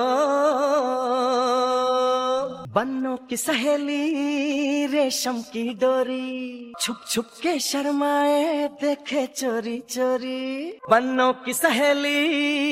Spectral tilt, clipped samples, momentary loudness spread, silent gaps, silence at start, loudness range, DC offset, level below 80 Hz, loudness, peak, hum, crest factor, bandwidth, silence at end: -2.5 dB/octave; under 0.1%; 8 LU; none; 0 s; 2 LU; under 0.1%; -70 dBFS; -23 LUFS; -4 dBFS; none; 18 dB; 16 kHz; 0 s